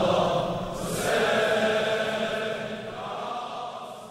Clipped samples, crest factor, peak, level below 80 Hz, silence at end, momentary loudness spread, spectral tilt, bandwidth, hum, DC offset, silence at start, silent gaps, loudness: under 0.1%; 16 dB; -12 dBFS; -52 dBFS; 0 s; 12 LU; -4 dB/octave; 16 kHz; none; under 0.1%; 0 s; none; -27 LUFS